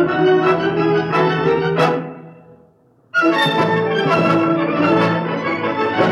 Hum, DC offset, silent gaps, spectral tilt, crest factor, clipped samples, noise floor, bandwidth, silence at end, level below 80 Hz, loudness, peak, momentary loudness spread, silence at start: none; under 0.1%; none; -7 dB/octave; 16 dB; under 0.1%; -53 dBFS; 12.5 kHz; 0 s; -56 dBFS; -16 LUFS; -2 dBFS; 5 LU; 0 s